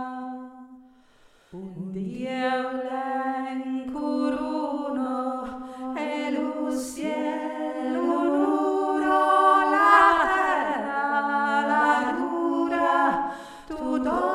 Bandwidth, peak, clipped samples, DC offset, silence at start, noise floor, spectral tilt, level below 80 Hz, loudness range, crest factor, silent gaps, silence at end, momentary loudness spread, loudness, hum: 14.5 kHz; -4 dBFS; under 0.1%; under 0.1%; 0 s; -57 dBFS; -5 dB/octave; -58 dBFS; 10 LU; 20 dB; none; 0 s; 15 LU; -24 LUFS; none